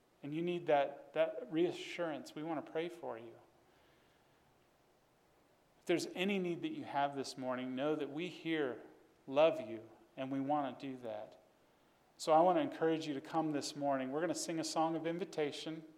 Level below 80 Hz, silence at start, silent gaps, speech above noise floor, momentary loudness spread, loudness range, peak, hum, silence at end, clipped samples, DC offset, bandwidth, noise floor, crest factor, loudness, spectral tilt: -86 dBFS; 0.25 s; none; 34 dB; 14 LU; 10 LU; -18 dBFS; none; 0.05 s; under 0.1%; under 0.1%; 15 kHz; -71 dBFS; 20 dB; -38 LUFS; -5 dB/octave